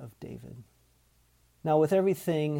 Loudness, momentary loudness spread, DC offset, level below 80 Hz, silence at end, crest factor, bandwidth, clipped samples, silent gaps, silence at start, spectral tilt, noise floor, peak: -27 LUFS; 21 LU; under 0.1%; -66 dBFS; 0 s; 16 dB; 17.5 kHz; under 0.1%; none; 0 s; -7.5 dB/octave; -66 dBFS; -14 dBFS